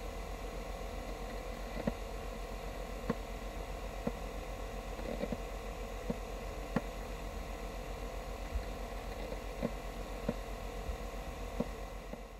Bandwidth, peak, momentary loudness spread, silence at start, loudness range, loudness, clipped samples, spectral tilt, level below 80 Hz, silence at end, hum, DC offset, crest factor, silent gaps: 16 kHz; -18 dBFS; 4 LU; 0 s; 1 LU; -43 LUFS; under 0.1%; -5.5 dB/octave; -44 dBFS; 0 s; none; under 0.1%; 22 dB; none